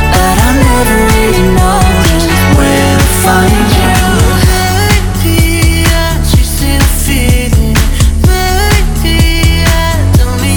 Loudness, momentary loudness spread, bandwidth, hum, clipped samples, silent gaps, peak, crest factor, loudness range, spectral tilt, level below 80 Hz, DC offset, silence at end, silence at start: -8 LUFS; 2 LU; over 20 kHz; none; 0.3%; none; 0 dBFS; 8 dB; 2 LU; -4.5 dB/octave; -12 dBFS; under 0.1%; 0 s; 0 s